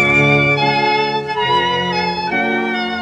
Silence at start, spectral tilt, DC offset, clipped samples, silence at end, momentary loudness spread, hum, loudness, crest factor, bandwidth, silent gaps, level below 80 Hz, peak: 0 s; -5.5 dB/octave; under 0.1%; under 0.1%; 0 s; 7 LU; none; -15 LUFS; 14 dB; 10 kHz; none; -46 dBFS; -2 dBFS